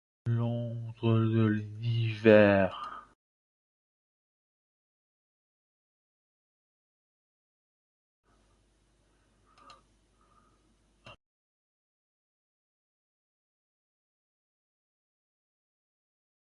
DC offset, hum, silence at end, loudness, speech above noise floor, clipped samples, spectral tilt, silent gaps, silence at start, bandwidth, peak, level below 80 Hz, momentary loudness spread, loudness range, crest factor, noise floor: under 0.1%; none; 5.35 s; -27 LUFS; 43 dB; under 0.1%; -9 dB/octave; 3.15-8.23 s; 0.25 s; 6.6 kHz; -8 dBFS; -64 dBFS; 18 LU; 10 LU; 26 dB; -69 dBFS